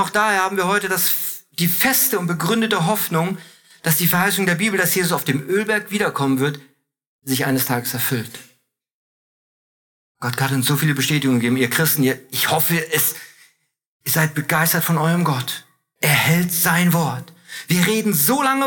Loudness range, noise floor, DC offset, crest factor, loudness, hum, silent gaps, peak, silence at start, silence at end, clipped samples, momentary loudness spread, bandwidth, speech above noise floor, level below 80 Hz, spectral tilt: 6 LU; -62 dBFS; under 0.1%; 18 dB; -18 LUFS; none; 7.07-7.19 s, 8.92-10.15 s, 13.86-14.00 s; -2 dBFS; 0 s; 0 s; under 0.1%; 10 LU; over 20 kHz; 43 dB; -62 dBFS; -4 dB/octave